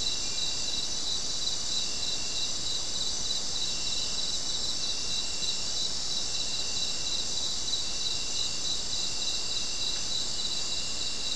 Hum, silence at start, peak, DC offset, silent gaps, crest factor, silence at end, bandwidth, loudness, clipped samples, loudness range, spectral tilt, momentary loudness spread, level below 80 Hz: none; 0 s; -16 dBFS; 2%; none; 16 dB; 0 s; 12 kHz; -29 LUFS; under 0.1%; 0 LU; 0 dB/octave; 1 LU; -50 dBFS